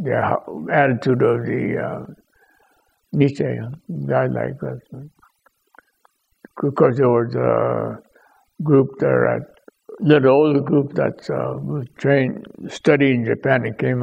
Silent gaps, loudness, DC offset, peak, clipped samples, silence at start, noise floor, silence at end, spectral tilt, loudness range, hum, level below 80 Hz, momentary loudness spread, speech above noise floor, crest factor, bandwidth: none; -19 LUFS; under 0.1%; 0 dBFS; under 0.1%; 0 s; -62 dBFS; 0 s; -8.5 dB/octave; 6 LU; none; -60 dBFS; 14 LU; 44 dB; 20 dB; 8.8 kHz